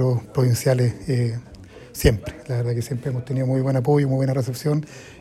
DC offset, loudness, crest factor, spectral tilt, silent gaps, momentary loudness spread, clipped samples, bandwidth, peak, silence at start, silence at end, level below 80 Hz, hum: under 0.1%; -22 LUFS; 20 dB; -7 dB/octave; none; 8 LU; under 0.1%; 14.5 kHz; -2 dBFS; 0 s; 0 s; -38 dBFS; none